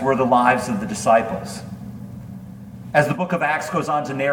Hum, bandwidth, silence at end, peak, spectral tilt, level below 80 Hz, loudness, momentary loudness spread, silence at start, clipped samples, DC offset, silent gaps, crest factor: none; 18.5 kHz; 0 s; -2 dBFS; -5.5 dB/octave; -52 dBFS; -20 LUFS; 20 LU; 0 s; under 0.1%; under 0.1%; none; 18 dB